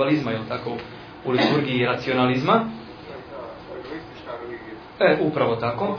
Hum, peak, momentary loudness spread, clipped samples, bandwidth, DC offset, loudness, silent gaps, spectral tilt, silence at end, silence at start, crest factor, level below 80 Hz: none; -4 dBFS; 17 LU; under 0.1%; 5.4 kHz; under 0.1%; -22 LUFS; none; -7.5 dB/octave; 0 s; 0 s; 20 dB; -56 dBFS